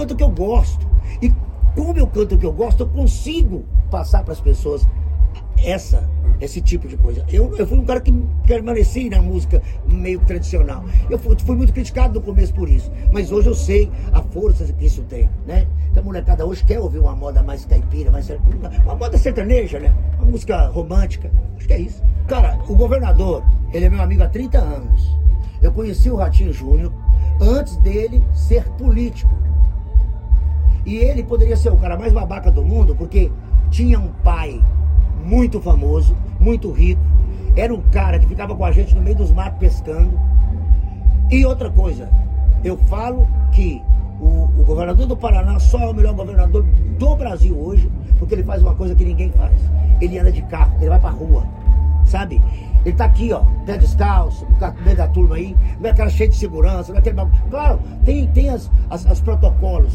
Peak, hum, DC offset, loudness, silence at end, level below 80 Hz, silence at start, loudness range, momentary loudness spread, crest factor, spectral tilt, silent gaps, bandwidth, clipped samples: 0 dBFS; none; under 0.1%; -17 LUFS; 0 s; -14 dBFS; 0 s; 2 LU; 4 LU; 12 dB; -8.5 dB/octave; none; 7.8 kHz; under 0.1%